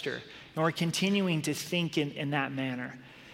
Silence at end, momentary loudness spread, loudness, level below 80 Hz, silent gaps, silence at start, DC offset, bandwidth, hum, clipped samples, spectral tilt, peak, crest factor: 0 s; 13 LU; -31 LUFS; -70 dBFS; none; 0 s; under 0.1%; 16.5 kHz; none; under 0.1%; -5 dB/octave; -14 dBFS; 18 dB